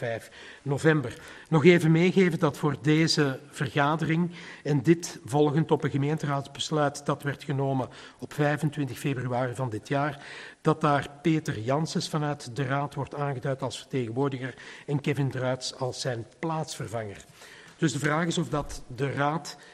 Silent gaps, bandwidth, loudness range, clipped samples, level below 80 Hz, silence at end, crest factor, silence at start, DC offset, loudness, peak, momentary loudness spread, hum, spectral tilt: none; 13 kHz; 7 LU; under 0.1%; -58 dBFS; 0 s; 22 dB; 0 s; under 0.1%; -27 LUFS; -4 dBFS; 13 LU; none; -6 dB/octave